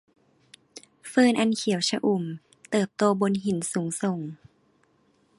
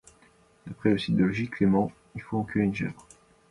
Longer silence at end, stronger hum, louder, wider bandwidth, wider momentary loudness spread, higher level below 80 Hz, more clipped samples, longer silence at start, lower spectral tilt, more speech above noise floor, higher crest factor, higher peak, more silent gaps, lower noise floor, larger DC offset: first, 1.05 s vs 0.5 s; neither; about the same, -25 LUFS vs -27 LUFS; about the same, 11.5 kHz vs 11 kHz; first, 19 LU vs 15 LU; second, -70 dBFS vs -56 dBFS; neither; about the same, 0.75 s vs 0.65 s; second, -5 dB/octave vs -7.5 dB/octave; first, 41 dB vs 34 dB; about the same, 20 dB vs 18 dB; about the same, -8 dBFS vs -10 dBFS; neither; first, -65 dBFS vs -60 dBFS; neither